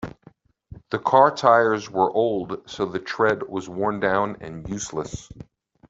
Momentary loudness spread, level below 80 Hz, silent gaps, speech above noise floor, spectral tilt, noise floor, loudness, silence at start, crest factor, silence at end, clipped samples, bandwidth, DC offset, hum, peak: 16 LU; -54 dBFS; none; 32 dB; -5 dB/octave; -54 dBFS; -22 LUFS; 0 s; 20 dB; 0.45 s; under 0.1%; 8 kHz; under 0.1%; none; -2 dBFS